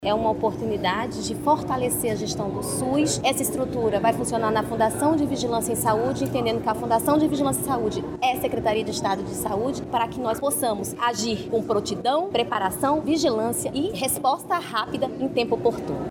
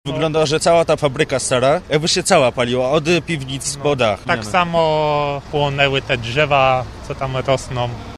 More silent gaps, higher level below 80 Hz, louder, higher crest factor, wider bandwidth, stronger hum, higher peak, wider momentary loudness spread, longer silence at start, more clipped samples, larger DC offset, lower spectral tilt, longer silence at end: neither; second, -48 dBFS vs -40 dBFS; second, -24 LUFS vs -17 LUFS; about the same, 16 dB vs 16 dB; first, 19 kHz vs 14 kHz; neither; second, -8 dBFS vs 0 dBFS; second, 5 LU vs 8 LU; about the same, 0 s vs 0.05 s; neither; neither; about the same, -4.5 dB/octave vs -4 dB/octave; about the same, 0 s vs 0 s